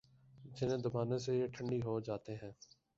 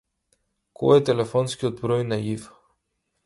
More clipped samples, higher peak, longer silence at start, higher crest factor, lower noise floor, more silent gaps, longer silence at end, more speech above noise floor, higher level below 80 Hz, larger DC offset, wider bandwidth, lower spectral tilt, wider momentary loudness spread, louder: neither; second, -24 dBFS vs -4 dBFS; second, 0.35 s vs 0.8 s; about the same, 16 dB vs 20 dB; second, -59 dBFS vs -76 dBFS; neither; second, 0.45 s vs 0.8 s; second, 20 dB vs 54 dB; second, -68 dBFS vs -58 dBFS; neither; second, 7.8 kHz vs 11.5 kHz; about the same, -7.5 dB/octave vs -6.5 dB/octave; first, 15 LU vs 10 LU; second, -39 LUFS vs -23 LUFS